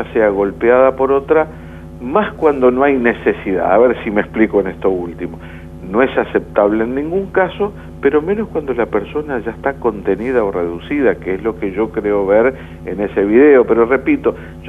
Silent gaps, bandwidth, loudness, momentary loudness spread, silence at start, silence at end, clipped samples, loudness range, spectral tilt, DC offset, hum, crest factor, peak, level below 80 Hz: none; 3.9 kHz; -15 LUFS; 10 LU; 0 s; 0 s; under 0.1%; 4 LU; -8.5 dB/octave; under 0.1%; 50 Hz at -40 dBFS; 14 dB; 0 dBFS; -38 dBFS